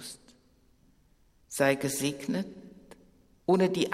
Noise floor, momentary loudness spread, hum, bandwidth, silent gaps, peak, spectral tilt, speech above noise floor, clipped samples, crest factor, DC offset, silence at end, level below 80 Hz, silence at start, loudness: -64 dBFS; 23 LU; none; 16 kHz; none; -10 dBFS; -4.5 dB/octave; 37 dB; under 0.1%; 20 dB; under 0.1%; 0 s; -66 dBFS; 0 s; -29 LUFS